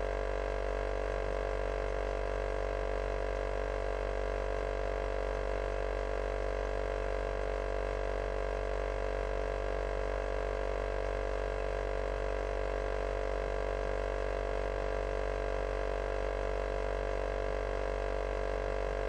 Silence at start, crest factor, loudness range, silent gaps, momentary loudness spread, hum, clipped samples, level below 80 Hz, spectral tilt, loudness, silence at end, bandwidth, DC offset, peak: 0 s; 12 dB; 0 LU; none; 0 LU; none; under 0.1%; -38 dBFS; -6 dB/octave; -36 LUFS; 0 s; 9.2 kHz; under 0.1%; -22 dBFS